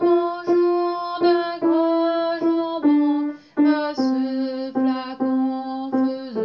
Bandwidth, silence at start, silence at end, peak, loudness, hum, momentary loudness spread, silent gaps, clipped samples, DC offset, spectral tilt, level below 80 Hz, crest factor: 6.4 kHz; 0 s; 0 s; -8 dBFS; -21 LUFS; none; 6 LU; none; under 0.1%; under 0.1%; -6.5 dB/octave; -74 dBFS; 14 dB